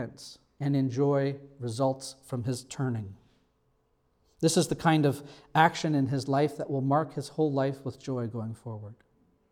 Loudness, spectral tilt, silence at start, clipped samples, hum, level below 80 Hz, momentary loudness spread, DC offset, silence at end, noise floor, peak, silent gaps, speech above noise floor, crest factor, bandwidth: -29 LUFS; -6 dB/octave; 0 s; under 0.1%; none; -66 dBFS; 15 LU; under 0.1%; 0.6 s; -71 dBFS; -6 dBFS; none; 42 dB; 22 dB; 15.5 kHz